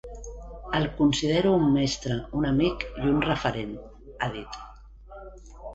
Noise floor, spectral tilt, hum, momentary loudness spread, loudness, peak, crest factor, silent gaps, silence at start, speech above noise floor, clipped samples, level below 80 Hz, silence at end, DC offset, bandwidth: -46 dBFS; -5.5 dB/octave; none; 23 LU; -26 LUFS; -10 dBFS; 16 dB; none; 0.05 s; 21 dB; under 0.1%; -42 dBFS; 0 s; under 0.1%; 8 kHz